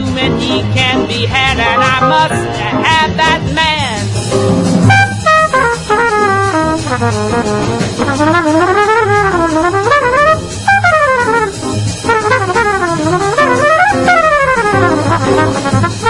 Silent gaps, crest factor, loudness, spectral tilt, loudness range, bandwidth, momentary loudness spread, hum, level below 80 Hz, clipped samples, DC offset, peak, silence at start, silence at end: none; 10 dB; -11 LUFS; -5 dB/octave; 2 LU; 11.5 kHz; 6 LU; none; -34 dBFS; 0.1%; under 0.1%; 0 dBFS; 0 s; 0 s